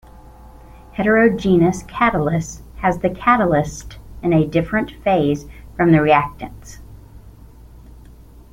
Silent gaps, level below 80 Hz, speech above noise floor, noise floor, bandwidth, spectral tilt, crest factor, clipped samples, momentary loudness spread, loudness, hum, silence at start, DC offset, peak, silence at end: none; -40 dBFS; 25 dB; -42 dBFS; 16 kHz; -7 dB/octave; 18 dB; under 0.1%; 18 LU; -17 LUFS; none; 0.95 s; under 0.1%; -2 dBFS; 0.75 s